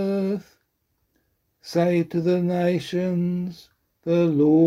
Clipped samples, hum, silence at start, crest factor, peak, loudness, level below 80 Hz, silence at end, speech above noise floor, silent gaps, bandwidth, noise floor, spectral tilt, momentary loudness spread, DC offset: under 0.1%; none; 0 s; 16 dB; -8 dBFS; -23 LUFS; -64 dBFS; 0 s; 51 dB; none; 12.5 kHz; -72 dBFS; -8 dB/octave; 12 LU; under 0.1%